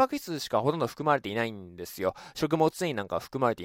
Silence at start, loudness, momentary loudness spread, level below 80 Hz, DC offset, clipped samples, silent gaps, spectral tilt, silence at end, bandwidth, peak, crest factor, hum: 0 s; -29 LUFS; 7 LU; -62 dBFS; under 0.1%; under 0.1%; none; -5.5 dB/octave; 0 s; 16.5 kHz; -10 dBFS; 20 dB; none